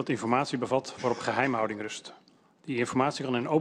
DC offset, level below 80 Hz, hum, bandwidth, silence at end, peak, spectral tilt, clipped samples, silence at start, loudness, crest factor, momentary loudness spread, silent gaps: under 0.1%; -68 dBFS; none; 11.5 kHz; 0 s; -10 dBFS; -5 dB/octave; under 0.1%; 0 s; -29 LUFS; 20 dB; 11 LU; none